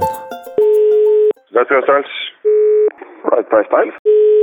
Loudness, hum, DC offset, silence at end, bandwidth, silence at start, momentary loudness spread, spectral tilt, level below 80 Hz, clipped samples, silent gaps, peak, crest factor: -14 LUFS; none; under 0.1%; 0 s; 17 kHz; 0 s; 9 LU; -5 dB/octave; -60 dBFS; under 0.1%; 3.99-4.05 s; 0 dBFS; 12 dB